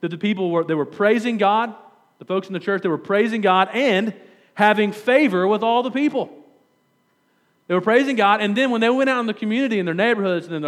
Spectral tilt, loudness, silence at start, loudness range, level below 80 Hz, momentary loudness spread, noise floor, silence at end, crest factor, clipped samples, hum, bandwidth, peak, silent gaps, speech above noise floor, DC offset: -6 dB/octave; -19 LUFS; 0 s; 3 LU; -86 dBFS; 7 LU; -64 dBFS; 0 s; 18 dB; under 0.1%; none; 13.5 kHz; -2 dBFS; none; 45 dB; under 0.1%